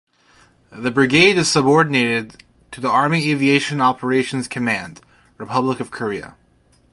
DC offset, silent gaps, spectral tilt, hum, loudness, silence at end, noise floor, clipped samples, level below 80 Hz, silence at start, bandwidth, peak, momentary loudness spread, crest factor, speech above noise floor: under 0.1%; none; -4.5 dB/octave; none; -17 LUFS; 0.6 s; -56 dBFS; under 0.1%; -56 dBFS; 0.75 s; 11.5 kHz; 0 dBFS; 13 LU; 18 dB; 39 dB